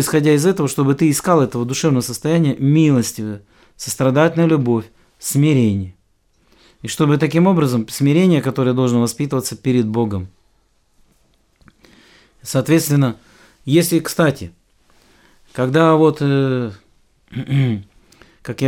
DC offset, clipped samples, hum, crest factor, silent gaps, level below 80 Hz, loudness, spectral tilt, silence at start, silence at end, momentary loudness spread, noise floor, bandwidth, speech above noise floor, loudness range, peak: under 0.1%; under 0.1%; none; 16 dB; none; -54 dBFS; -16 LUFS; -6 dB/octave; 0 s; 0 s; 16 LU; -59 dBFS; 18 kHz; 44 dB; 6 LU; 0 dBFS